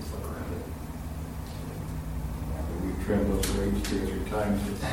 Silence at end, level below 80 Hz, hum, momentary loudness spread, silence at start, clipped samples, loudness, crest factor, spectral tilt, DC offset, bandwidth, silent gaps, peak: 0 s; -36 dBFS; none; 10 LU; 0 s; under 0.1%; -32 LUFS; 16 dB; -6 dB/octave; 0.2%; 17 kHz; none; -14 dBFS